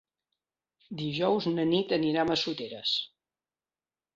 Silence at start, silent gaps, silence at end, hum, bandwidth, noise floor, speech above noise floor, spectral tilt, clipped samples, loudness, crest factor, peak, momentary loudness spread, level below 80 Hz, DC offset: 0.9 s; none; 1.1 s; none; 7.6 kHz; under -90 dBFS; over 61 dB; -5.5 dB/octave; under 0.1%; -29 LUFS; 18 dB; -14 dBFS; 9 LU; -68 dBFS; under 0.1%